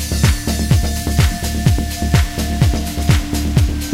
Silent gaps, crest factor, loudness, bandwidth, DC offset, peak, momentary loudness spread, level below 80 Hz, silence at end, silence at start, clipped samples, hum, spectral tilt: none; 16 dB; -17 LUFS; 16 kHz; under 0.1%; 0 dBFS; 3 LU; -20 dBFS; 0 s; 0 s; under 0.1%; none; -5 dB/octave